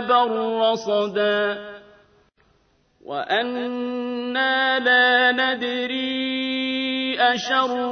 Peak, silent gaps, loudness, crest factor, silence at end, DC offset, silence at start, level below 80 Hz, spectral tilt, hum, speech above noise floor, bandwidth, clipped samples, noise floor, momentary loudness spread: -6 dBFS; none; -21 LUFS; 16 dB; 0 s; under 0.1%; 0 s; -66 dBFS; -3.5 dB/octave; none; 41 dB; 6.6 kHz; under 0.1%; -62 dBFS; 11 LU